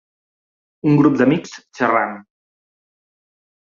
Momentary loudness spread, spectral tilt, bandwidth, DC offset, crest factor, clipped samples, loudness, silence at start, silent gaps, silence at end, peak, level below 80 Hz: 16 LU; -7.5 dB/octave; 7.4 kHz; under 0.1%; 18 dB; under 0.1%; -17 LUFS; 0.85 s; none; 1.45 s; -2 dBFS; -62 dBFS